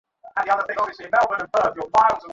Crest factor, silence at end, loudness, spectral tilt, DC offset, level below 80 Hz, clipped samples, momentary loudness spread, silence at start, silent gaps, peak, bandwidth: 16 dB; 0 s; -21 LUFS; -4 dB/octave; under 0.1%; -58 dBFS; under 0.1%; 8 LU; 0.25 s; none; -6 dBFS; 8 kHz